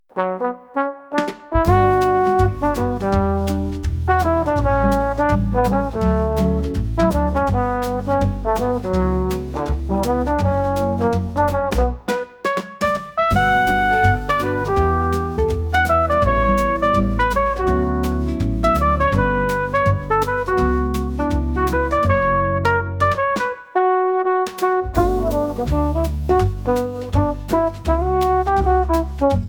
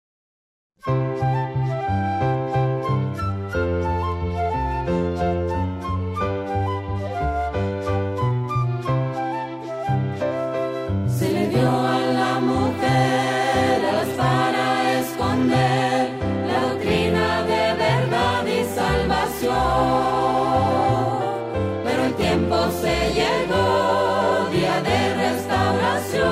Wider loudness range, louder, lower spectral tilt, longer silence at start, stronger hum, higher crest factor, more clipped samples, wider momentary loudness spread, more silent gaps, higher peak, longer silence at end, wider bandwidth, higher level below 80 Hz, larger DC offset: about the same, 2 LU vs 4 LU; about the same, -19 LUFS vs -21 LUFS; about the same, -7 dB/octave vs -6 dB/octave; second, 0.15 s vs 0.85 s; neither; about the same, 16 dB vs 14 dB; neither; about the same, 6 LU vs 6 LU; neither; first, -4 dBFS vs -8 dBFS; about the same, 0 s vs 0 s; first, 19.5 kHz vs 16 kHz; first, -28 dBFS vs -38 dBFS; neither